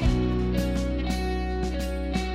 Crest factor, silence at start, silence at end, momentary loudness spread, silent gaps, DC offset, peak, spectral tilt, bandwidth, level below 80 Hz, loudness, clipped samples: 14 dB; 0 s; 0 s; 4 LU; none; under 0.1%; -12 dBFS; -6.5 dB/octave; 15 kHz; -28 dBFS; -28 LUFS; under 0.1%